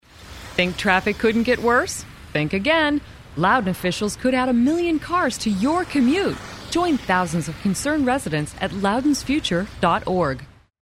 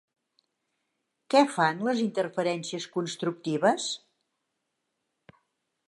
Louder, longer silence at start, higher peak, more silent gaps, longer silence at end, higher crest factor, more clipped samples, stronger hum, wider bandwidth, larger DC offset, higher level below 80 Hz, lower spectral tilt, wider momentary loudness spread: first, -21 LUFS vs -27 LUFS; second, 0.2 s vs 1.3 s; first, -2 dBFS vs -8 dBFS; neither; second, 0.35 s vs 1.9 s; about the same, 20 dB vs 22 dB; neither; neither; first, 16 kHz vs 11.5 kHz; neither; first, -44 dBFS vs -84 dBFS; about the same, -5 dB/octave vs -4.5 dB/octave; about the same, 8 LU vs 10 LU